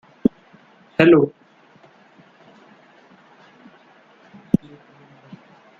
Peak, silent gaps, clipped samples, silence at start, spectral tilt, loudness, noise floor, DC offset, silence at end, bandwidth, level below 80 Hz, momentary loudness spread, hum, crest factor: -2 dBFS; none; under 0.1%; 0.25 s; -8.5 dB/octave; -18 LUFS; -52 dBFS; under 0.1%; 4.5 s; 4.7 kHz; -56 dBFS; 11 LU; none; 22 dB